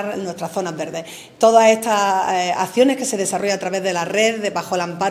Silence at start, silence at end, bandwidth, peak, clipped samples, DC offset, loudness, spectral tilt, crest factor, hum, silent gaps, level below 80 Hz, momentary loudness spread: 0 s; 0 s; 16 kHz; 0 dBFS; under 0.1%; under 0.1%; -18 LUFS; -3.5 dB/octave; 18 dB; none; none; -66 dBFS; 12 LU